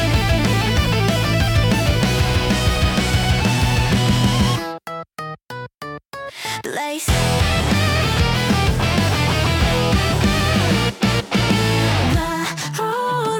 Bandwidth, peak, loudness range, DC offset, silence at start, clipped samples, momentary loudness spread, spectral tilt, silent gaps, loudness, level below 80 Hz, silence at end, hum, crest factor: 17.5 kHz; -4 dBFS; 5 LU; under 0.1%; 0 s; under 0.1%; 13 LU; -5 dB/octave; 5.74-5.78 s; -18 LUFS; -28 dBFS; 0 s; none; 14 dB